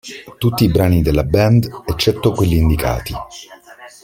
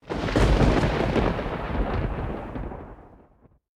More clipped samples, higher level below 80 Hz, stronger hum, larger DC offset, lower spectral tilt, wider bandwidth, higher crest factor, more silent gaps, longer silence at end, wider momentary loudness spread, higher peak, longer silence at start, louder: neither; about the same, -28 dBFS vs -30 dBFS; neither; neither; about the same, -6.5 dB/octave vs -7 dB/octave; first, 17 kHz vs 11 kHz; about the same, 16 dB vs 20 dB; neither; second, 0.15 s vs 0.6 s; about the same, 15 LU vs 16 LU; first, 0 dBFS vs -6 dBFS; about the same, 0.05 s vs 0.05 s; first, -16 LUFS vs -25 LUFS